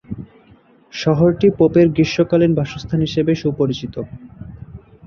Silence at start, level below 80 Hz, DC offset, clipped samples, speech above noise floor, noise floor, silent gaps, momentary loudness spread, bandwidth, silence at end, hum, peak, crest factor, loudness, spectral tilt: 0.1 s; -44 dBFS; under 0.1%; under 0.1%; 34 dB; -50 dBFS; none; 22 LU; 7 kHz; 0 s; none; -2 dBFS; 16 dB; -16 LUFS; -7.5 dB/octave